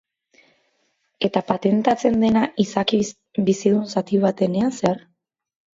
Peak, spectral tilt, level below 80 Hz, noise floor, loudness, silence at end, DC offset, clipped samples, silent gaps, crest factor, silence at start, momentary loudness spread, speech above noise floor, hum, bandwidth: -4 dBFS; -6 dB/octave; -58 dBFS; -69 dBFS; -21 LUFS; 0.8 s; under 0.1%; under 0.1%; none; 18 dB; 1.2 s; 5 LU; 49 dB; none; 7.8 kHz